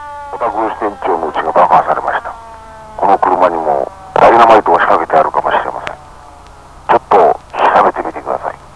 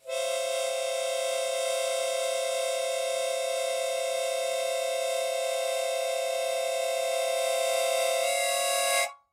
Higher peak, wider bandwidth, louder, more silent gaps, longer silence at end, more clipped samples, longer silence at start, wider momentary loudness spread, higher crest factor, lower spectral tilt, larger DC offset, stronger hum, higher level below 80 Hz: first, 0 dBFS vs -14 dBFS; second, 11 kHz vs 16 kHz; first, -11 LUFS vs -28 LUFS; neither; about the same, 0.2 s vs 0.15 s; first, 0.7% vs under 0.1%; about the same, 0 s vs 0.05 s; first, 15 LU vs 3 LU; about the same, 12 dB vs 14 dB; first, -5.5 dB/octave vs 3 dB/octave; first, 0.4% vs under 0.1%; neither; first, -42 dBFS vs -84 dBFS